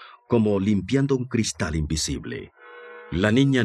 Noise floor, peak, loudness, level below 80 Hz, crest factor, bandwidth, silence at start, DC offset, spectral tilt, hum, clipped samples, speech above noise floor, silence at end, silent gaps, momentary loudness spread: -43 dBFS; -6 dBFS; -23 LUFS; -42 dBFS; 18 dB; 13.5 kHz; 0 s; under 0.1%; -5.5 dB/octave; none; under 0.1%; 21 dB; 0 s; none; 20 LU